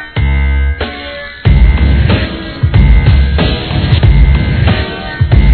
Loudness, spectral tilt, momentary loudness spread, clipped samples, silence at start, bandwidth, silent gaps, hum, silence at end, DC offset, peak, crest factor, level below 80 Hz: -11 LUFS; -10 dB/octave; 10 LU; 2%; 0 s; 4.5 kHz; none; none; 0 s; 0.3%; 0 dBFS; 8 dB; -12 dBFS